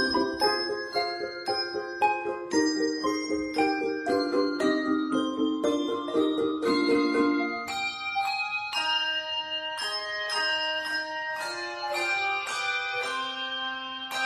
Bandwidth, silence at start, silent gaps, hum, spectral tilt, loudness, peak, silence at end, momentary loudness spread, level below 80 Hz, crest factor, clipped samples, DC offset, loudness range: 13.5 kHz; 0 s; none; none; -2.5 dB/octave; -28 LUFS; -12 dBFS; 0 s; 6 LU; -64 dBFS; 16 dB; under 0.1%; under 0.1%; 2 LU